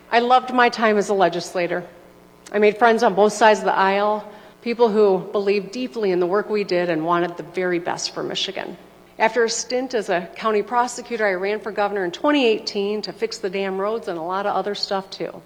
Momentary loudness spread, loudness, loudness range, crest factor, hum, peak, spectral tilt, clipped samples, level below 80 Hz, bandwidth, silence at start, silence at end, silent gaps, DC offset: 10 LU; -20 LUFS; 5 LU; 20 dB; none; -2 dBFS; -4 dB/octave; under 0.1%; -64 dBFS; 13.5 kHz; 0.1 s; 0.05 s; none; under 0.1%